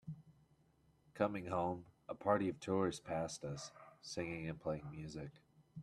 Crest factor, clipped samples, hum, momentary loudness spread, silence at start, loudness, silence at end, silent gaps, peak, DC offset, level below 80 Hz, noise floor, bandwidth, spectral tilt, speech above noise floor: 24 dB; under 0.1%; none; 17 LU; 0.05 s; -42 LUFS; 0 s; none; -20 dBFS; under 0.1%; -70 dBFS; -73 dBFS; 13 kHz; -6 dB/octave; 32 dB